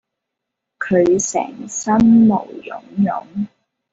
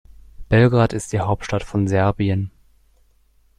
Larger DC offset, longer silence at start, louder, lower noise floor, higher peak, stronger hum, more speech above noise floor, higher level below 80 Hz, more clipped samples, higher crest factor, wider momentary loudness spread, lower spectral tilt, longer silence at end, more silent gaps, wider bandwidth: neither; first, 0.8 s vs 0.4 s; first, -16 LUFS vs -19 LUFS; first, -80 dBFS vs -57 dBFS; about the same, -4 dBFS vs -2 dBFS; neither; first, 64 dB vs 39 dB; second, -50 dBFS vs -40 dBFS; neither; about the same, 14 dB vs 18 dB; first, 17 LU vs 8 LU; about the same, -6 dB/octave vs -7 dB/octave; second, 0.45 s vs 1.1 s; neither; second, 8 kHz vs 11 kHz